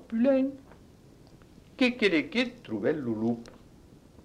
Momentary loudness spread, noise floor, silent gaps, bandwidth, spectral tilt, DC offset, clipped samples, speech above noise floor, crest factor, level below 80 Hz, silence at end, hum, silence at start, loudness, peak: 8 LU; -54 dBFS; none; 10.5 kHz; -6 dB/octave; under 0.1%; under 0.1%; 27 dB; 18 dB; -62 dBFS; 0.65 s; none; 0 s; -28 LUFS; -12 dBFS